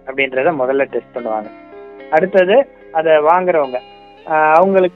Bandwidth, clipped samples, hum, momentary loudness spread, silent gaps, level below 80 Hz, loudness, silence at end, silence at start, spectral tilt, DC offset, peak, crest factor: 6 kHz; under 0.1%; none; 12 LU; none; -58 dBFS; -14 LUFS; 0.05 s; 0.05 s; -7.5 dB/octave; under 0.1%; 0 dBFS; 14 dB